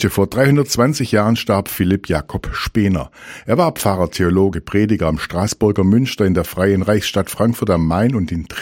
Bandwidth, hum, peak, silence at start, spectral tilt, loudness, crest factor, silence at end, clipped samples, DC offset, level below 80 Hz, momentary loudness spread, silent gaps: 17 kHz; none; 0 dBFS; 0 s; -6 dB/octave; -17 LUFS; 16 dB; 0 s; under 0.1%; under 0.1%; -36 dBFS; 7 LU; none